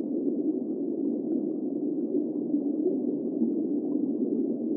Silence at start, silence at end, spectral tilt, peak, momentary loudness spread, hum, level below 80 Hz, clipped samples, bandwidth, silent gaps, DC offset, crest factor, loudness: 0 s; 0 s; -14.5 dB/octave; -16 dBFS; 2 LU; none; under -90 dBFS; under 0.1%; 1.2 kHz; none; under 0.1%; 14 dB; -29 LUFS